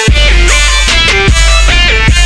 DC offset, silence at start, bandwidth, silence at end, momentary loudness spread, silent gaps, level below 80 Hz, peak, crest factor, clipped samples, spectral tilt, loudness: under 0.1%; 0 s; 11 kHz; 0 s; 1 LU; none; -8 dBFS; 0 dBFS; 6 dB; 0.2%; -2.5 dB/octave; -6 LUFS